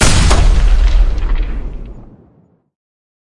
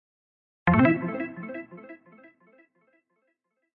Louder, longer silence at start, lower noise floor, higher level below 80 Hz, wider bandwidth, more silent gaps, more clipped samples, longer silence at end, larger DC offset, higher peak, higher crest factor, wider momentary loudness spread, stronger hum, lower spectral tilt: first, -15 LUFS vs -25 LUFS; second, 0 s vs 0.65 s; second, -51 dBFS vs -76 dBFS; first, -14 dBFS vs -56 dBFS; first, 11.5 kHz vs 4.9 kHz; neither; neither; second, 1.25 s vs 1.8 s; neither; first, 0 dBFS vs -8 dBFS; second, 12 dB vs 22 dB; second, 19 LU vs 24 LU; neither; second, -4 dB/octave vs -11 dB/octave